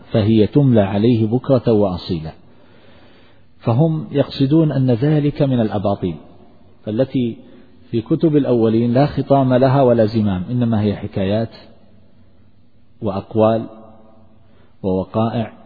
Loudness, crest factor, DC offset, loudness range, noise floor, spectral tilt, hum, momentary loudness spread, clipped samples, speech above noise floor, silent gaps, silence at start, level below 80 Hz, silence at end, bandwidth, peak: -17 LUFS; 16 dB; 0.5%; 7 LU; -54 dBFS; -11 dB/octave; none; 12 LU; under 0.1%; 38 dB; none; 0.1 s; -48 dBFS; 0.15 s; 4.9 kHz; -2 dBFS